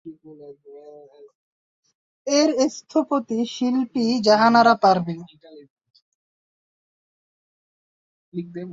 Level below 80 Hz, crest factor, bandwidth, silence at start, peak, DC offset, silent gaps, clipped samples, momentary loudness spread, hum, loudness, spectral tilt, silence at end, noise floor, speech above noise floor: -68 dBFS; 20 dB; 7.8 kHz; 0.05 s; -4 dBFS; under 0.1%; 1.35-1.83 s, 1.95-2.25 s, 5.70-5.76 s, 6.02-8.32 s; under 0.1%; 20 LU; none; -19 LUFS; -4.5 dB/octave; 0 s; -45 dBFS; 26 dB